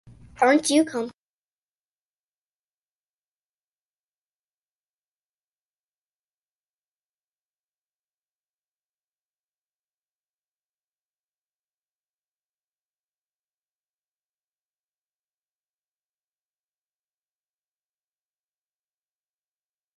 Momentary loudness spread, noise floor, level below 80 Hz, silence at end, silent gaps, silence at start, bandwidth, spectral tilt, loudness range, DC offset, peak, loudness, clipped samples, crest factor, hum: 13 LU; under -90 dBFS; -72 dBFS; 18.9 s; none; 0.4 s; 11 kHz; -2.5 dB/octave; 14 LU; under 0.1%; -6 dBFS; -21 LUFS; under 0.1%; 28 dB; none